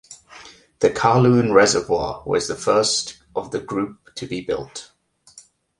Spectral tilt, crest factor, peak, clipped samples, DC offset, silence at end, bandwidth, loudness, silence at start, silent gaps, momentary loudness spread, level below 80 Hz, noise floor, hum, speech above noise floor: -4.5 dB/octave; 20 dB; -2 dBFS; under 0.1%; under 0.1%; 0.4 s; 11.5 kHz; -20 LUFS; 0.1 s; none; 15 LU; -50 dBFS; -50 dBFS; none; 31 dB